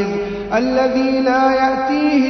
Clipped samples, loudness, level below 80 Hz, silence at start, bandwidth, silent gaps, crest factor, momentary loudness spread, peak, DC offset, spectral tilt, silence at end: under 0.1%; -16 LUFS; -44 dBFS; 0 s; 6.4 kHz; none; 14 dB; 6 LU; -2 dBFS; under 0.1%; -5.5 dB/octave; 0 s